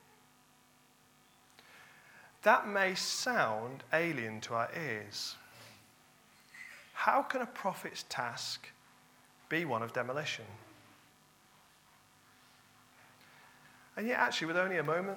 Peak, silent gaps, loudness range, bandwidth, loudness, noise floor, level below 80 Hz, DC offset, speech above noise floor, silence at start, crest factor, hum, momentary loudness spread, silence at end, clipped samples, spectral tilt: -12 dBFS; none; 8 LU; 17.5 kHz; -34 LUFS; -66 dBFS; -86 dBFS; under 0.1%; 31 dB; 1.7 s; 24 dB; none; 24 LU; 0 s; under 0.1%; -3.5 dB/octave